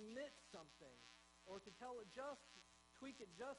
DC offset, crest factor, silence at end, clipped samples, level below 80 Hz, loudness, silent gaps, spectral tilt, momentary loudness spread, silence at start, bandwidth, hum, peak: under 0.1%; 18 dB; 0 s; under 0.1%; -82 dBFS; -58 LUFS; none; -3.5 dB/octave; 11 LU; 0 s; 10.5 kHz; none; -40 dBFS